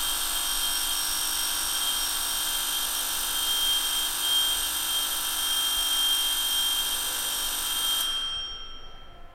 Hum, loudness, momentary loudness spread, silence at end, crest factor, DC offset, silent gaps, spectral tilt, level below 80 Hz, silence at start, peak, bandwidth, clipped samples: none; -24 LUFS; 4 LU; 0 s; 14 dB; under 0.1%; none; 2 dB/octave; -46 dBFS; 0 s; -12 dBFS; 16.5 kHz; under 0.1%